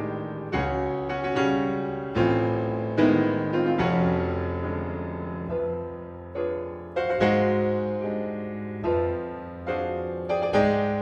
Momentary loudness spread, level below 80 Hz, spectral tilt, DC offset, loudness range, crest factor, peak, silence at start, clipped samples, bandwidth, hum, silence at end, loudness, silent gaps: 11 LU; -46 dBFS; -8 dB/octave; under 0.1%; 4 LU; 18 dB; -8 dBFS; 0 s; under 0.1%; 7.8 kHz; none; 0 s; -26 LUFS; none